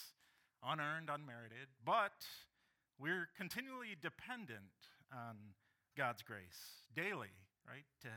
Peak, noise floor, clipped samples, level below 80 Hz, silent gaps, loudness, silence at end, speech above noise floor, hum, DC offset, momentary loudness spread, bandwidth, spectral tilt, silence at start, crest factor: -26 dBFS; -77 dBFS; under 0.1%; -88 dBFS; none; -46 LUFS; 0 s; 31 dB; none; under 0.1%; 18 LU; 18 kHz; -4.5 dB/octave; 0 s; 22 dB